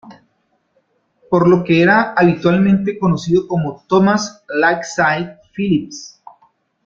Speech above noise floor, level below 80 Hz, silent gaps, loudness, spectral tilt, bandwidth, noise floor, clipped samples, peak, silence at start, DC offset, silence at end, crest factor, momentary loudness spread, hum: 50 dB; -52 dBFS; none; -15 LUFS; -6.5 dB/octave; 7.6 kHz; -64 dBFS; under 0.1%; -2 dBFS; 0.05 s; under 0.1%; 0.8 s; 16 dB; 10 LU; none